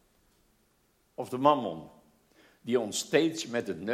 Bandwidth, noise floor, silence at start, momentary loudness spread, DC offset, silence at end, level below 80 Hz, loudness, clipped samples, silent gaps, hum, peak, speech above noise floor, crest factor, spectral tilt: 16 kHz; -70 dBFS; 1.2 s; 18 LU; under 0.1%; 0 s; -72 dBFS; -29 LUFS; under 0.1%; none; none; -8 dBFS; 41 dB; 24 dB; -4 dB/octave